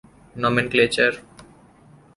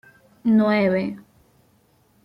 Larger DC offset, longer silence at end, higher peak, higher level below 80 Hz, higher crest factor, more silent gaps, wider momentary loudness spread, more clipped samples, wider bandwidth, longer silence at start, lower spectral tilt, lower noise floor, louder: neither; second, 0.75 s vs 1.05 s; first, -4 dBFS vs -8 dBFS; first, -54 dBFS vs -62 dBFS; first, 20 dB vs 14 dB; neither; second, 7 LU vs 14 LU; neither; first, 11.5 kHz vs 5.4 kHz; about the same, 0.35 s vs 0.45 s; second, -4.5 dB/octave vs -8.5 dB/octave; second, -51 dBFS vs -60 dBFS; about the same, -20 LUFS vs -20 LUFS